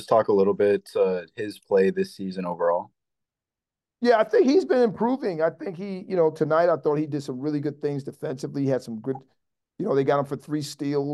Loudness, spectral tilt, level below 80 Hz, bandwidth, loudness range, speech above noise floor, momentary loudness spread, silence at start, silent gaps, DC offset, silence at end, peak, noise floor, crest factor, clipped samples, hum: -24 LUFS; -7 dB/octave; -72 dBFS; 12.5 kHz; 5 LU; 66 dB; 13 LU; 0 s; none; under 0.1%; 0 s; -6 dBFS; -89 dBFS; 18 dB; under 0.1%; none